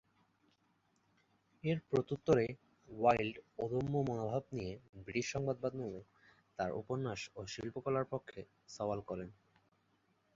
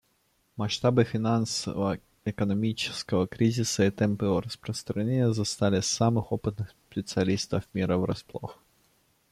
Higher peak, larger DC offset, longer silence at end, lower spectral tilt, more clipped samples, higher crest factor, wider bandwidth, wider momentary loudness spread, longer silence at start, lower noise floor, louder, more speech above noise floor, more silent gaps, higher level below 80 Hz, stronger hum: second, -16 dBFS vs -10 dBFS; neither; first, 1.05 s vs 0.8 s; about the same, -6 dB/octave vs -5.5 dB/octave; neither; first, 24 dB vs 18 dB; second, 7.6 kHz vs 15 kHz; first, 19 LU vs 11 LU; first, 1.65 s vs 0.55 s; first, -77 dBFS vs -70 dBFS; second, -38 LUFS vs -28 LUFS; second, 39 dB vs 43 dB; first, 4.89-4.93 s vs none; second, -66 dBFS vs -58 dBFS; neither